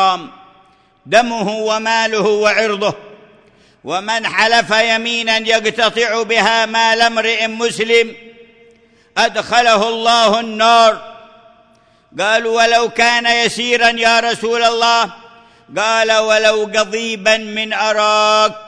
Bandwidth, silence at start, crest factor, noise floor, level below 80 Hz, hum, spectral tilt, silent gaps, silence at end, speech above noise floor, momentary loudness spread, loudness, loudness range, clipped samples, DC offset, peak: 10.5 kHz; 0 s; 14 dB; -51 dBFS; -56 dBFS; none; -2 dB/octave; none; 0 s; 38 dB; 7 LU; -13 LUFS; 3 LU; under 0.1%; under 0.1%; 0 dBFS